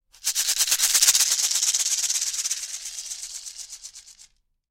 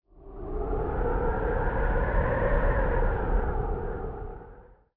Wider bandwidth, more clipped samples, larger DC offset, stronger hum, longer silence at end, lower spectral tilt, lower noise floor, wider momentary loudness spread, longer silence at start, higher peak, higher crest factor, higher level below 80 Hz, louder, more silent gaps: first, 16.5 kHz vs 3.6 kHz; neither; neither; neither; first, 0.6 s vs 0.35 s; second, 5 dB/octave vs -11.5 dB/octave; first, -56 dBFS vs -50 dBFS; first, 20 LU vs 13 LU; about the same, 0.25 s vs 0.15 s; first, -2 dBFS vs -14 dBFS; first, 24 dB vs 14 dB; second, -64 dBFS vs -30 dBFS; first, -20 LUFS vs -29 LUFS; neither